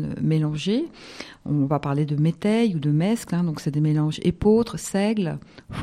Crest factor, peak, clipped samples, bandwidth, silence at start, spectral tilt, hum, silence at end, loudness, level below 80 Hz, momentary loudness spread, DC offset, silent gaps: 14 dB; -8 dBFS; under 0.1%; 13.5 kHz; 0 s; -7 dB/octave; none; 0 s; -23 LUFS; -48 dBFS; 11 LU; under 0.1%; none